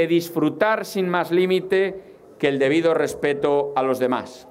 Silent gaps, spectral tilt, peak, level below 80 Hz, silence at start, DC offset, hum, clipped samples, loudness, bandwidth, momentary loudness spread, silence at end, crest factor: none; -5.5 dB/octave; -4 dBFS; -62 dBFS; 0 s; under 0.1%; none; under 0.1%; -21 LUFS; 16 kHz; 5 LU; 0.1 s; 16 dB